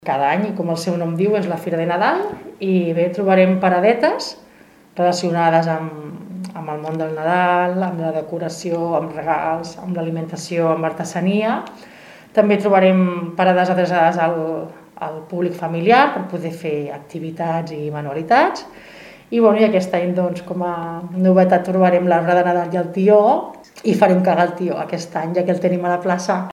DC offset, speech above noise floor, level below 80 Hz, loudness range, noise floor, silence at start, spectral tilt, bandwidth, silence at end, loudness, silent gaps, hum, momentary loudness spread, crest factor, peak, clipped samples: under 0.1%; 30 dB; -64 dBFS; 5 LU; -48 dBFS; 0.05 s; -6.5 dB/octave; 13 kHz; 0 s; -18 LUFS; none; none; 12 LU; 18 dB; 0 dBFS; under 0.1%